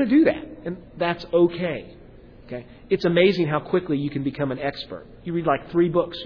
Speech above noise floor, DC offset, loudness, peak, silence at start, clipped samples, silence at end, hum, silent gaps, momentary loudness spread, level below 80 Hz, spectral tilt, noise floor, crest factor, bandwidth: 23 dB; under 0.1%; -23 LUFS; -6 dBFS; 0 s; under 0.1%; 0 s; none; none; 17 LU; -50 dBFS; -8.5 dB/octave; -46 dBFS; 18 dB; 5.4 kHz